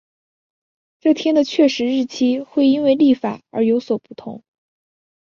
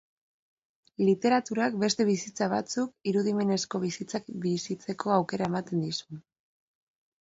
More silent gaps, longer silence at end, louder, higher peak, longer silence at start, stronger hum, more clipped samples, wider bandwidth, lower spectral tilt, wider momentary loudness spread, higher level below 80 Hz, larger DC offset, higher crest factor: neither; second, 0.85 s vs 1 s; first, -18 LUFS vs -29 LUFS; first, -4 dBFS vs -10 dBFS; about the same, 1.05 s vs 1 s; neither; neither; second, 7.2 kHz vs 8 kHz; about the same, -5.5 dB/octave vs -5 dB/octave; about the same, 10 LU vs 10 LU; about the same, -66 dBFS vs -70 dBFS; neither; about the same, 16 dB vs 20 dB